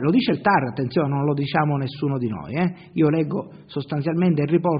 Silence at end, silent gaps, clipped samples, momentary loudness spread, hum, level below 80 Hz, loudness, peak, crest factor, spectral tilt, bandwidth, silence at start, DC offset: 0 s; none; under 0.1%; 7 LU; none; -58 dBFS; -22 LUFS; -4 dBFS; 18 dB; -6.5 dB/octave; 5.2 kHz; 0 s; under 0.1%